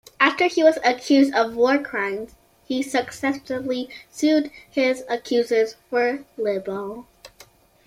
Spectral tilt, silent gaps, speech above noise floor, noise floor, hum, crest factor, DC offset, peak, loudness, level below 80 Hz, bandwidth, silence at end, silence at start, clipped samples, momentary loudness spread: -3.5 dB/octave; none; 30 dB; -52 dBFS; none; 20 dB; under 0.1%; -2 dBFS; -22 LUFS; -62 dBFS; 15 kHz; 0.6 s; 0.2 s; under 0.1%; 12 LU